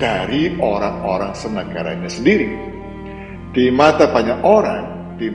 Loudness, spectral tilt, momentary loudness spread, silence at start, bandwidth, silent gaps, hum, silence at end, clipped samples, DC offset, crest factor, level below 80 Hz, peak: -17 LUFS; -6 dB/octave; 18 LU; 0 s; 10.5 kHz; none; none; 0 s; under 0.1%; under 0.1%; 18 dB; -40 dBFS; 0 dBFS